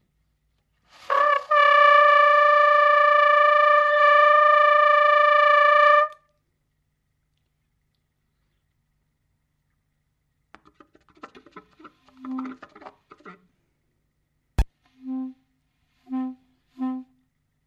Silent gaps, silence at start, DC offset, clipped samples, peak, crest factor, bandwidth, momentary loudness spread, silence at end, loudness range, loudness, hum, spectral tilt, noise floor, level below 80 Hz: none; 1.1 s; under 0.1%; under 0.1%; -6 dBFS; 16 dB; 7.6 kHz; 19 LU; 0.65 s; 21 LU; -16 LUFS; 50 Hz at -70 dBFS; -5 dB/octave; -73 dBFS; -44 dBFS